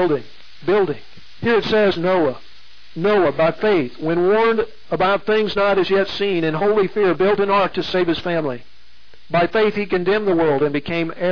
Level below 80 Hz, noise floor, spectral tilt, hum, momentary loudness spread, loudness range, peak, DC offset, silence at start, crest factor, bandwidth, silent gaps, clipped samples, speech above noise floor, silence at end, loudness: -50 dBFS; -52 dBFS; -7 dB/octave; none; 7 LU; 2 LU; -8 dBFS; 2%; 0 s; 10 dB; 5.4 kHz; none; under 0.1%; 34 dB; 0 s; -18 LUFS